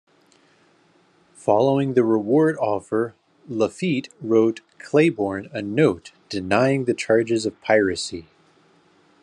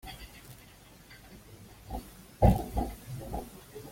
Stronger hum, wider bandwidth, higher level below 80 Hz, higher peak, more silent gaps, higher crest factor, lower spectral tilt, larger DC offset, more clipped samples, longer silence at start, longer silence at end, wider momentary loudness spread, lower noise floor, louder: neither; second, 10.5 kHz vs 16.5 kHz; second, -68 dBFS vs -40 dBFS; first, -2 dBFS vs -8 dBFS; neither; second, 20 dB vs 26 dB; second, -6 dB/octave vs -7.5 dB/octave; neither; neither; first, 1.45 s vs 0.05 s; first, 1 s vs 0 s; second, 12 LU vs 26 LU; first, -59 dBFS vs -54 dBFS; first, -21 LUFS vs -32 LUFS